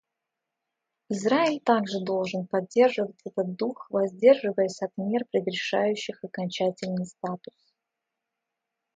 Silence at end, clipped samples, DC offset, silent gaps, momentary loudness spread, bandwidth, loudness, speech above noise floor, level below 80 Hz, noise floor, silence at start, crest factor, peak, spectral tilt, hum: 1.6 s; under 0.1%; under 0.1%; none; 11 LU; 9.2 kHz; -26 LUFS; 59 dB; -76 dBFS; -85 dBFS; 1.1 s; 20 dB; -6 dBFS; -5.5 dB/octave; none